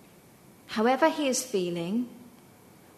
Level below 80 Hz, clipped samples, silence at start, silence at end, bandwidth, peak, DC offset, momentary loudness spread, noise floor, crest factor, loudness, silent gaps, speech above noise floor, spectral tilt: -72 dBFS; under 0.1%; 0.7 s; 0.7 s; 13.5 kHz; -10 dBFS; under 0.1%; 10 LU; -55 dBFS; 20 dB; -27 LUFS; none; 28 dB; -4 dB/octave